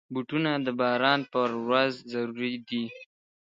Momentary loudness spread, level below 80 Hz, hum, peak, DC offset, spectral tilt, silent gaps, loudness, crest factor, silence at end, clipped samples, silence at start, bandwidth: 9 LU; -76 dBFS; none; -6 dBFS; under 0.1%; -6.5 dB/octave; none; -28 LUFS; 22 dB; 0.4 s; under 0.1%; 0.1 s; 7.6 kHz